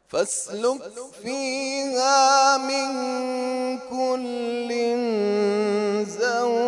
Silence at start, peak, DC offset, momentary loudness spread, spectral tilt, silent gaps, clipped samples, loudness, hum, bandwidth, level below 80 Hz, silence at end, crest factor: 0.15 s; -6 dBFS; under 0.1%; 10 LU; -2.5 dB/octave; none; under 0.1%; -23 LUFS; none; 11.5 kHz; -72 dBFS; 0 s; 16 dB